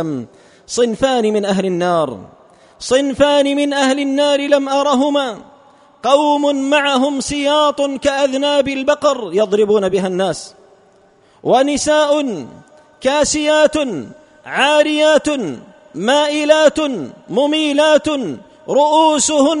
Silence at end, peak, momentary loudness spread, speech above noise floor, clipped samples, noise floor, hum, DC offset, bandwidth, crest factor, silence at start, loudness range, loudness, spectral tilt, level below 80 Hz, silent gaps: 0 s; 0 dBFS; 12 LU; 36 dB; under 0.1%; -50 dBFS; none; under 0.1%; 11 kHz; 16 dB; 0 s; 2 LU; -15 LUFS; -3.5 dB/octave; -50 dBFS; none